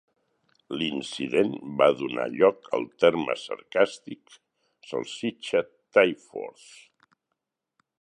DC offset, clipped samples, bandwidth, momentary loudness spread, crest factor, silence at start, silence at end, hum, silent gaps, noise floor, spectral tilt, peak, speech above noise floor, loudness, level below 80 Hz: under 0.1%; under 0.1%; 10 kHz; 15 LU; 22 dB; 0.7 s; 1.5 s; none; none; -83 dBFS; -5 dB/octave; -4 dBFS; 57 dB; -26 LUFS; -70 dBFS